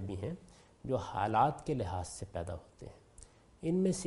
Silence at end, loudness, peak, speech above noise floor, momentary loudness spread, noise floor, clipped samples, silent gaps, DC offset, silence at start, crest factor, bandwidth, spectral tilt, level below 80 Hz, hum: 0 s; -36 LUFS; -16 dBFS; 24 dB; 22 LU; -58 dBFS; under 0.1%; none; under 0.1%; 0 s; 20 dB; 11.5 kHz; -6 dB/octave; -56 dBFS; none